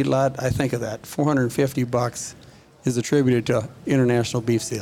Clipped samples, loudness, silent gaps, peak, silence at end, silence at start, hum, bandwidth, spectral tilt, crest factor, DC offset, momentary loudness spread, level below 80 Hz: under 0.1%; -22 LUFS; none; -8 dBFS; 0 s; 0 s; none; 16.5 kHz; -6 dB/octave; 14 dB; under 0.1%; 9 LU; -50 dBFS